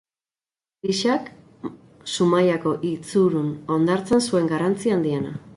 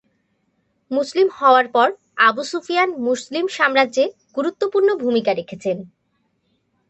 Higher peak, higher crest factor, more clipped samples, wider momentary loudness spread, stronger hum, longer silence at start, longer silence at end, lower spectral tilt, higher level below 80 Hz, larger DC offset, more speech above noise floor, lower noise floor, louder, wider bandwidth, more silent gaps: second, -8 dBFS vs -2 dBFS; about the same, 14 dB vs 18 dB; neither; first, 17 LU vs 11 LU; neither; about the same, 0.85 s vs 0.9 s; second, 0 s vs 1.05 s; first, -5.5 dB/octave vs -4 dB/octave; first, -60 dBFS vs -70 dBFS; neither; first, over 69 dB vs 50 dB; first, under -90 dBFS vs -68 dBFS; second, -22 LUFS vs -19 LUFS; first, 11.5 kHz vs 8.6 kHz; neither